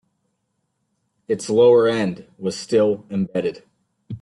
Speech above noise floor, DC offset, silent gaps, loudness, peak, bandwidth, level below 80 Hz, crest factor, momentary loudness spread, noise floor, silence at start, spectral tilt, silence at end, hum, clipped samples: 54 dB; under 0.1%; none; -20 LUFS; -4 dBFS; 11.5 kHz; -64 dBFS; 16 dB; 14 LU; -73 dBFS; 1.3 s; -6 dB/octave; 0.05 s; none; under 0.1%